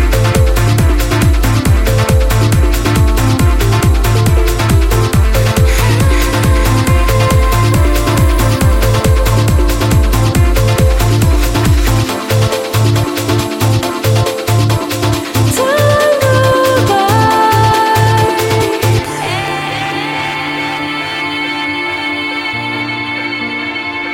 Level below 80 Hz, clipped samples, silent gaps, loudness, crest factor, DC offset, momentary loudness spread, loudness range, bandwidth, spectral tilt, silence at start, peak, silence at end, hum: -16 dBFS; under 0.1%; none; -12 LUFS; 10 dB; under 0.1%; 6 LU; 6 LU; 17 kHz; -5.5 dB/octave; 0 s; 0 dBFS; 0 s; none